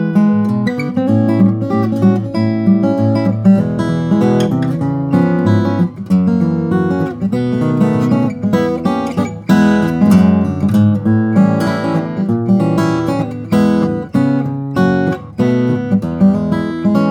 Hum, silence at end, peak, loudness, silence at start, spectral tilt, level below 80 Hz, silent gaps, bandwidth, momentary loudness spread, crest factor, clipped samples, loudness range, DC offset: none; 0 s; 0 dBFS; -14 LUFS; 0 s; -8.5 dB/octave; -48 dBFS; none; 10.5 kHz; 5 LU; 12 dB; under 0.1%; 2 LU; under 0.1%